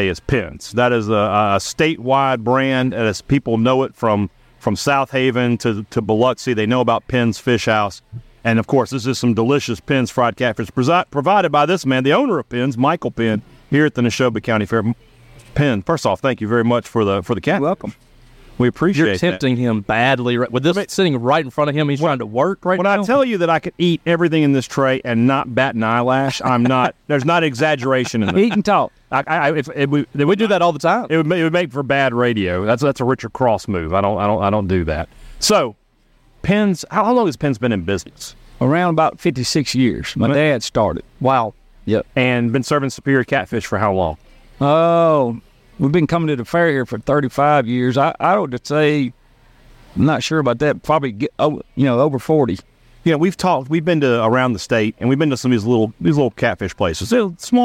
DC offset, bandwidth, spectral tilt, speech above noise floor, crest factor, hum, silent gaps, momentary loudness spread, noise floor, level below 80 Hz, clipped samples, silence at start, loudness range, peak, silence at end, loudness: under 0.1%; 16 kHz; -6 dB/octave; 38 dB; 14 dB; none; none; 5 LU; -55 dBFS; -44 dBFS; under 0.1%; 0 s; 2 LU; -4 dBFS; 0 s; -17 LUFS